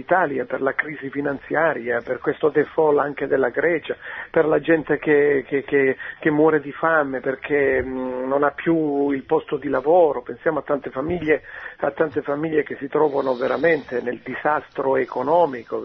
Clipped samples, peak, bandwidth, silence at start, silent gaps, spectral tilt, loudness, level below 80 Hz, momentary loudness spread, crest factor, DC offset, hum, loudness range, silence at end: under 0.1%; -4 dBFS; 5.8 kHz; 0 s; none; -9 dB/octave; -21 LUFS; -54 dBFS; 8 LU; 16 dB; under 0.1%; none; 3 LU; 0 s